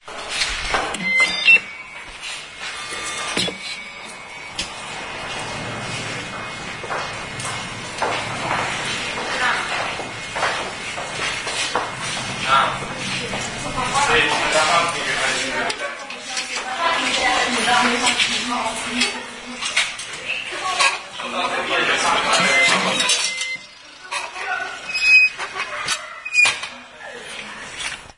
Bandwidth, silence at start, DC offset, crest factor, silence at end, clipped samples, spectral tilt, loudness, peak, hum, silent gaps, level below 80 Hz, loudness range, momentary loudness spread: 11 kHz; 0.05 s; under 0.1%; 20 dB; 0.05 s; under 0.1%; -1.5 dB/octave; -20 LUFS; -2 dBFS; none; none; -48 dBFS; 9 LU; 14 LU